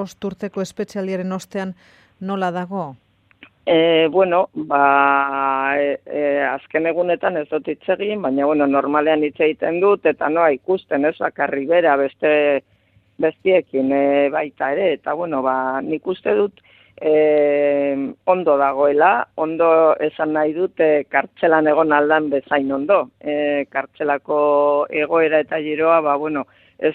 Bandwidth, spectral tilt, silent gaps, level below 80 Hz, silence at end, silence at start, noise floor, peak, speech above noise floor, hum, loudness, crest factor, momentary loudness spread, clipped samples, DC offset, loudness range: 8.4 kHz; -6.5 dB/octave; none; -64 dBFS; 0 s; 0 s; -50 dBFS; 0 dBFS; 32 dB; none; -18 LUFS; 18 dB; 10 LU; under 0.1%; under 0.1%; 3 LU